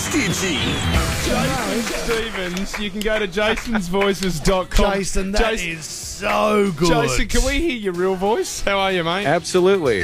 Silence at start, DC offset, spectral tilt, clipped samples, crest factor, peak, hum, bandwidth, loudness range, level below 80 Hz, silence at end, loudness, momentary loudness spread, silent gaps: 0 s; under 0.1%; -4 dB/octave; under 0.1%; 16 dB; -2 dBFS; none; 16 kHz; 2 LU; -28 dBFS; 0 s; -20 LUFS; 7 LU; none